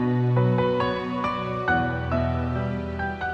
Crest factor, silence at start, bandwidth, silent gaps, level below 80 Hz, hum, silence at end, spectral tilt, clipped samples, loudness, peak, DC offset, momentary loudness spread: 14 dB; 0 s; 6.2 kHz; none; -40 dBFS; none; 0 s; -8.5 dB/octave; under 0.1%; -25 LUFS; -10 dBFS; under 0.1%; 7 LU